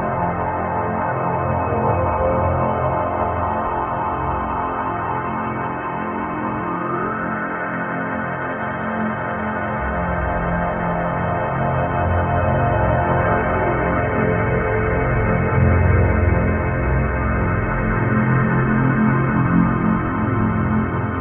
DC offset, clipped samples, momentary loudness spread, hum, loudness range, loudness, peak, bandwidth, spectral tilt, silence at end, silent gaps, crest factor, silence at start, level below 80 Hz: under 0.1%; under 0.1%; 6 LU; none; 5 LU; -20 LUFS; -4 dBFS; 3.4 kHz; -12 dB/octave; 0 s; none; 16 dB; 0 s; -30 dBFS